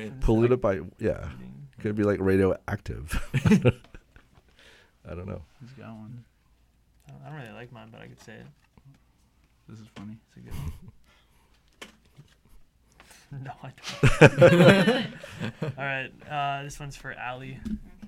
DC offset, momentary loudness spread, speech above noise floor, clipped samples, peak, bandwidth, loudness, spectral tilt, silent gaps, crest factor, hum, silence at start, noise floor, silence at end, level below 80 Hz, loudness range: under 0.1%; 27 LU; 38 dB; under 0.1%; 0 dBFS; 15.5 kHz; -24 LUFS; -6.5 dB/octave; none; 26 dB; none; 0 s; -63 dBFS; 0 s; -42 dBFS; 25 LU